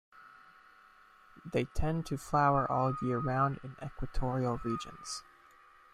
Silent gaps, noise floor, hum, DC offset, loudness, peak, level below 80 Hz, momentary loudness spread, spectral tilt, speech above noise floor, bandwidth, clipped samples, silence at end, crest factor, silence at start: none; -60 dBFS; none; under 0.1%; -33 LUFS; -16 dBFS; -46 dBFS; 14 LU; -6.5 dB/octave; 28 dB; 14 kHz; under 0.1%; 0.7 s; 18 dB; 0.15 s